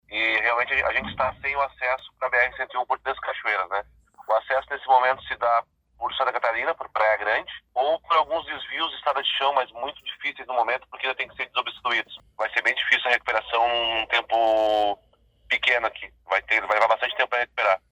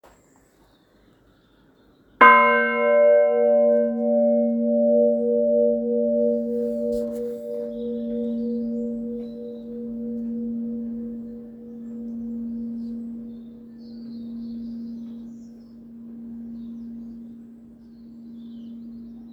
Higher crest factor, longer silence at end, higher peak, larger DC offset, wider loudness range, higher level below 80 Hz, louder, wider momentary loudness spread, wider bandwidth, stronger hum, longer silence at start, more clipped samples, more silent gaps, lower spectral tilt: about the same, 20 dB vs 24 dB; first, 0.15 s vs 0 s; second, -4 dBFS vs 0 dBFS; neither; second, 4 LU vs 20 LU; about the same, -58 dBFS vs -60 dBFS; second, -24 LUFS vs -21 LUFS; second, 9 LU vs 23 LU; first, 11.5 kHz vs 4.9 kHz; neither; second, 0.1 s vs 2.2 s; neither; neither; second, -2.5 dB/octave vs -7 dB/octave